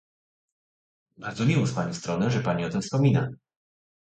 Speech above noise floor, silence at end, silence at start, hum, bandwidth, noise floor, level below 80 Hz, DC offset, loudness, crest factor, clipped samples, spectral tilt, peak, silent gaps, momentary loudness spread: over 65 dB; 0.8 s; 1.2 s; none; 9 kHz; under -90 dBFS; -58 dBFS; under 0.1%; -26 LUFS; 18 dB; under 0.1%; -6.5 dB/octave; -10 dBFS; none; 11 LU